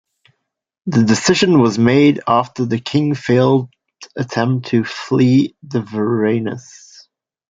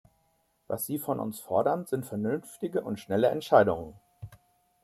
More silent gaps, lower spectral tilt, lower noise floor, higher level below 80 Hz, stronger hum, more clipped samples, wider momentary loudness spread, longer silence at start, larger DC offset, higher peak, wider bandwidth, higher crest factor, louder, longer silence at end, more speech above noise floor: neither; about the same, -6 dB/octave vs -6 dB/octave; first, -75 dBFS vs -71 dBFS; first, -56 dBFS vs -64 dBFS; neither; neither; second, 12 LU vs 24 LU; first, 0.85 s vs 0.7 s; neither; first, -2 dBFS vs -8 dBFS; second, 9.2 kHz vs 15.5 kHz; second, 14 dB vs 22 dB; first, -16 LUFS vs -29 LUFS; first, 0.9 s vs 0.5 s; first, 60 dB vs 43 dB